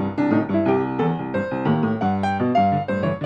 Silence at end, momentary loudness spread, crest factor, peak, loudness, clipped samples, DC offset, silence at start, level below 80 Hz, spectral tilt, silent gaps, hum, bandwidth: 0 s; 4 LU; 14 dB; -6 dBFS; -21 LUFS; under 0.1%; under 0.1%; 0 s; -56 dBFS; -9 dB/octave; none; none; 9 kHz